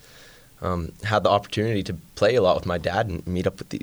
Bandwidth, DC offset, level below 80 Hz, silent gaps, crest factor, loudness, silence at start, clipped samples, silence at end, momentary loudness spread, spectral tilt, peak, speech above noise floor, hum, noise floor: over 20 kHz; under 0.1%; -46 dBFS; none; 18 dB; -24 LUFS; 0.2 s; under 0.1%; 0 s; 9 LU; -6 dB/octave; -6 dBFS; 26 dB; none; -49 dBFS